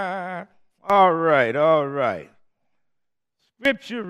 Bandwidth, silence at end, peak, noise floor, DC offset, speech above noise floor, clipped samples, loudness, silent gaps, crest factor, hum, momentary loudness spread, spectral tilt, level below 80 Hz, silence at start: 11.5 kHz; 0 s; -4 dBFS; -79 dBFS; under 0.1%; 60 dB; under 0.1%; -20 LUFS; none; 18 dB; none; 17 LU; -6.5 dB/octave; -68 dBFS; 0 s